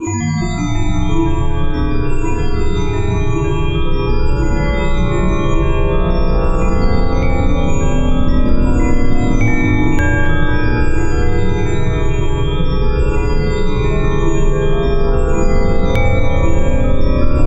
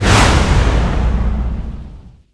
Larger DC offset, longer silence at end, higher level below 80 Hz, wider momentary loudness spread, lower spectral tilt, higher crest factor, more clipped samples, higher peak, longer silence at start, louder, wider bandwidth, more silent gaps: neither; second, 0 s vs 0.25 s; about the same, -14 dBFS vs -16 dBFS; second, 3 LU vs 17 LU; first, -7 dB/octave vs -5 dB/octave; about the same, 12 dB vs 14 dB; neither; about the same, 0 dBFS vs 0 dBFS; about the same, 0 s vs 0 s; about the same, -17 LUFS vs -15 LUFS; second, 7.6 kHz vs 11 kHz; neither